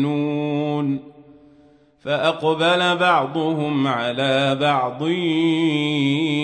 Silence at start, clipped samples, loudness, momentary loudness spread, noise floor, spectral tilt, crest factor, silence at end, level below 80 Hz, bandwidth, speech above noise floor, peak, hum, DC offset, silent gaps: 0 s; under 0.1%; -20 LUFS; 5 LU; -53 dBFS; -6 dB/octave; 16 dB; 0 s; -66 dBFS; 9.4 kHz; 34 dB; -4 dBFS; none; under 0.1%; none